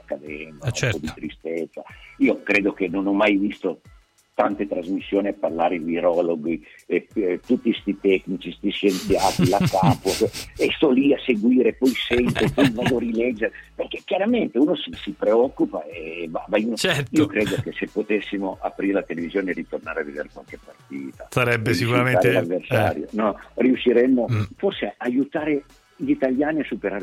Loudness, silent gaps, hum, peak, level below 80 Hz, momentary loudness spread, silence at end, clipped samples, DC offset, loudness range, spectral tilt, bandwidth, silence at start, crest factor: -22 LUFS; none; none; -6 dBFS; -50 dBFS; 12 LU; 0 s; under 0.1%; under 0.1%; 4 LU; -6 dB/octave; 16 kHz; 0.1 s; 16 dB